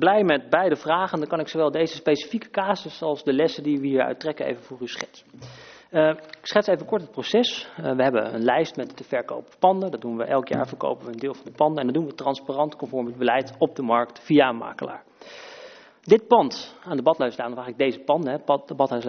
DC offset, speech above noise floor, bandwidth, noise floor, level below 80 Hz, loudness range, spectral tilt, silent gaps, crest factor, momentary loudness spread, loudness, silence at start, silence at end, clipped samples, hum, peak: under 0.1%; 22 dB; 6.6 kHz; -46 dBFS; -68 dBFS; 3 LU; -3.5 dB/octave; none; 22 dB; 14 LU; -24 LUFS; 0 s; 0 s; under 0.1%; none; -2 dBFS